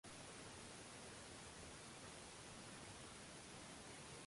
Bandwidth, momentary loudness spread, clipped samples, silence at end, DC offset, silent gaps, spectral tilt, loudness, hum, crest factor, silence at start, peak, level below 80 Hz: 11.5 kHz; 0 LU; under 0.1%; 0.05 s; under 0.1%; none; -3 dB/octave; -56 LUFS; none; 14 dB; 0.05 s; -44 dBFS; -72 dBFS